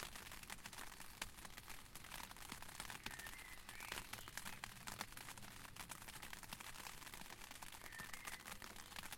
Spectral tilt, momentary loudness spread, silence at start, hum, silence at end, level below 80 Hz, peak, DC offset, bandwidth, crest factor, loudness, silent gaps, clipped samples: -1.5 dB/octave; 5 LU; 0 s; none; 0 s; -64 dBFS; -26 dBFS; under 0.1%; 17 kHz; 28 dB; -52 LUFS; none; under 0.1%